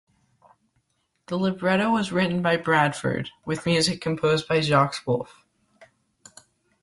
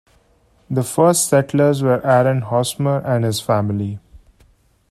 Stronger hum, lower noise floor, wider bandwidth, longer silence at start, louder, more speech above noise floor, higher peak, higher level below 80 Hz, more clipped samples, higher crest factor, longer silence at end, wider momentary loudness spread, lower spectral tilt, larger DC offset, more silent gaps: neither; first, -72 dBFS vs -56 dBFS; second, 11.5 kHz vs 15 kHz; first, 1.3 s vs 0.7 s; second, -23 LUFS vs -17 LUFS; first, 49 dB vs 40 dB; second, -8 dBFS vs -2 dBFS; second, -60 dBFS vs -54 dBFS; neither; about the same, 18 dB vs 18 dB; first, 1.6 s vs 0.75 s; about the same, 8 LU vs 9 LU; about the same, -5 dB/octave vs -5.5 dB/octave; neither; neither